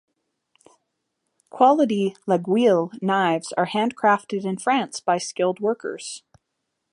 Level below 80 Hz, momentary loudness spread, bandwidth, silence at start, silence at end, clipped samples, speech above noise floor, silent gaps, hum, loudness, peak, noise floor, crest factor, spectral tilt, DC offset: -74 dBFS; 10 LU; 11.5 kHz; 1.55 s; 0.75 s; under 0.1%; 57 dB; none; none; -22 LUFS; -4 dBFS; -78 dBFS; 20 dB; -5 dB/octave; under 0.1%